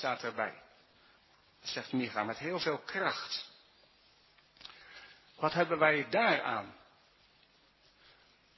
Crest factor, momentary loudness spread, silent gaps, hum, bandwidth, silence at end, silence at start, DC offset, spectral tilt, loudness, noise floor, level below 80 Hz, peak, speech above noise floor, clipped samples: 24 dB; 24 LU; none; none; 6.2 kHz; 1.85 s; 0 s; under 0.1%; -5 dB/octave; -33 LUFS; -67 dBFS; -76 dBFS; -12 dBFS; 33 dB; under 0.1%